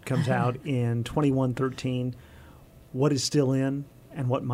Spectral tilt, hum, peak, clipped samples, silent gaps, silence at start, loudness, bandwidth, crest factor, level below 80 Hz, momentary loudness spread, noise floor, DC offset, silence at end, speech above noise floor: -6 dB/octave; none; -12 dBFS; under 0.1%; none; 0.05 s; -27 LUFS; 15 kHz; 16 dB; -54 dBFS; 11 LU; -51 dBFS; under 0.1%; 0 s; 25 dB